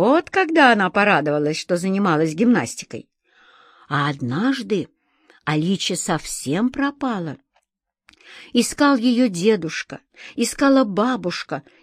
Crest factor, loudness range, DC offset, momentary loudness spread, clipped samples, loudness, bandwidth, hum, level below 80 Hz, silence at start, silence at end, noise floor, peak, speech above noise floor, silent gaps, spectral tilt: 20 dB; 6 LU; under 0.1%; 14 LU; under 0.1%; -20 LUFS; 15 kHz; none; -56 dBFS; 0 s; 0.25 s; -75 dBFS; -2 dBFS; 55 dB; none; -4.5 dB/octave